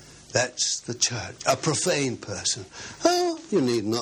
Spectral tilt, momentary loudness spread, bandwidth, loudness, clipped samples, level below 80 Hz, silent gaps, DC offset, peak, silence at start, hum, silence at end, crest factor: -3 dB/octave; 5 LU; 16 kHz; -25 LUFS; under 0.1%; -62 dBFS; none; under 0.1%; -6 dBFS; 0 s; none; 0 s; 20 dB